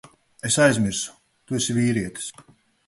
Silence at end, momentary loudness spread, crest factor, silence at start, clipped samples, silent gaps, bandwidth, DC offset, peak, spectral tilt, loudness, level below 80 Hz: 0.45 s; 15 LU; 20 dB; 0.45 s; under 0.1%; none; 12 kHz; under 0.1%; -6 dBFS; -4 dB/octave; -22 LUFS; -54 dBFS